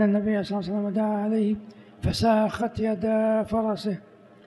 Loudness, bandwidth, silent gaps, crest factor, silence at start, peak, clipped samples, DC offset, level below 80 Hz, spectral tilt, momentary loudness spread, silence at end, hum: -25 LUFS; 12 kHz; none; 16 dB; 0 s; -10 dBFS; under 0.1%; under 0.1%; -46 dBFS; -7 dB/octave; 8 LU; 0.45 s; none